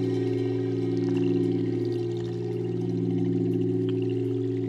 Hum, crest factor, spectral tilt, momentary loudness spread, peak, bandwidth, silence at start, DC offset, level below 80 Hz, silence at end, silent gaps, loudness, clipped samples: none; 12 dB; -9.5 dB/octave; 5 LU; -14 dBFS; 7.8 kHz; 0 s; under 0.1%; -64 dBFS; 0 s; none; -27 LUFS; under 0.1%